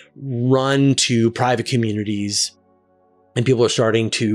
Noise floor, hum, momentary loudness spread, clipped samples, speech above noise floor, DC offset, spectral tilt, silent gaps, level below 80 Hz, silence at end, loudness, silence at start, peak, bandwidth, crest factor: -58 dBFS; none; 8 LU; under 0.1%; 40 dB; under 0.1%; -4.5 dB/octave; none; -64 dBFS; 0 s; -18 LUFS; 0.2 s; -6 dBFS; 13 kHz; 12 dB